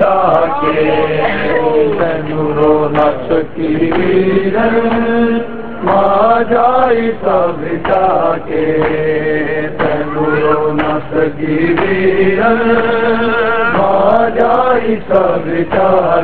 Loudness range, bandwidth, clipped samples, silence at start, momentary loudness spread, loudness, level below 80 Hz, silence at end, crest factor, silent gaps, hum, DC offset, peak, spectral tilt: 2 LU; 4.7 kHz; under 0.1%; 0 s; 5 LU; -12 LUFS; -38 dBFS; 0 s; 12 dB; none; none; 6%; 0 dBFS; -9.5 dB/octave